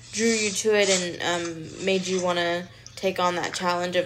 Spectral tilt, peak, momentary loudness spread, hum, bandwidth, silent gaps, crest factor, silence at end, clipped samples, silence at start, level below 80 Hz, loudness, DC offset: -3 dB/octave; -8 dBFS; 9 LU; none; 16 kHz; none; 18 dB; 0 s; under 0.1%; 0 s; -62 dBFS; -24 LUFS; under 0.1%